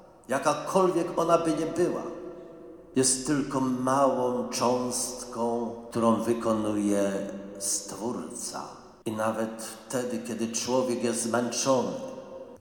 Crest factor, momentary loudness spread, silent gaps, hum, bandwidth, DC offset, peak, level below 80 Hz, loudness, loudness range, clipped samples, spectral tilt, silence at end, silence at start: 20 dB; 14 LU; none; none; 19 kHz; under 0.1%; -8 dBFS; -62 dBFS; -28 LUFS; 5 LU; under 0.1%; -4 dB/octave; 0.05 s; 0 s